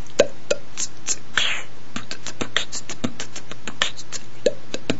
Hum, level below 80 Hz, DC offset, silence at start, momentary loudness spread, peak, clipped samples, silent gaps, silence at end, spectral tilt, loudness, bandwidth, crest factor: none; -54 dBFS; 10%; 0 s; 13 LU; 0 dBFS; under 0.1%; none; 0 s; -2 dB/octave; -26 LUFS; 8.2 kHz; 26 dB